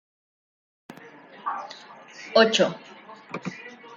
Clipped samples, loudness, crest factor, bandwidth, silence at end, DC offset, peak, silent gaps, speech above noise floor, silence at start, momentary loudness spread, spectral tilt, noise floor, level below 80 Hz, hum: under 0.1%; -24 LUFS; 24 dB; 9.2 kHz; 0 s; under 0.1%; -4 dBFS; none; 24 dB; 0.9 s; 26 LU; -3.5 dB/octave; -47 dBFS; -76 dBFS; none